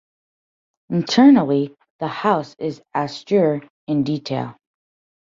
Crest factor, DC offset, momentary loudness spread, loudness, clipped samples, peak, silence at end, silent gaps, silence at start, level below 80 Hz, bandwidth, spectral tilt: 18 dB; under 0.1%; 16 LU; -19 LUFS; under 0.1%; -2 dBFS; 0.7 s; 1.90-1.99 s, 3.70-3.87 s; 0.9 s; -64 dBFS; 7.4 kHz; -6.5 dB/octave